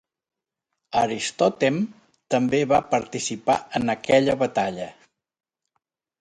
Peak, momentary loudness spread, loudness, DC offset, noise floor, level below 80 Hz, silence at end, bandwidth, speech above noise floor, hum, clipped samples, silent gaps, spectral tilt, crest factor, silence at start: -4 dBFS; 9 LU; -23 LUFS; under 0.1%; -82 dBFS; -58 dBFS; 1.3 s; 11 kHz; 60 dB; none; under 0.1%; none; -4.5 dB/octave; 20 dB; 0.9 s